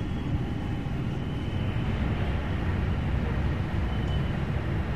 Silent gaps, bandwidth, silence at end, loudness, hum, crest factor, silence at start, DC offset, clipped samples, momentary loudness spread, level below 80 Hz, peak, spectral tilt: none; 8.8 kHz; 0 s; -30 LUFS; none; 12 dB; 0 s; 0.8%; under 0.1%; 3 LU; -34 dBFS; -16 dBFS; -8 dB/octave